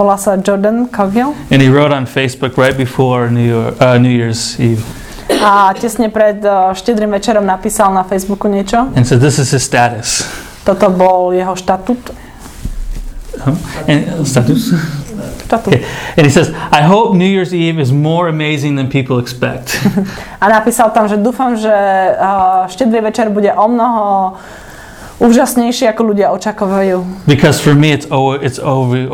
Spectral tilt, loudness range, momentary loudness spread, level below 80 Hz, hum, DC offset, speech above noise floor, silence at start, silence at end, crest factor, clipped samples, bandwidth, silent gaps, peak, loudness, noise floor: -5.5 dB/octave; 4 LU; 10 LU; -34 dBFS; none; under 0.1%; 20 dB; 0 s; 0 s; 12 dB; 0.4%; 17 kHz; none; 0 dBFS; -11 LUFS; -31 dBFS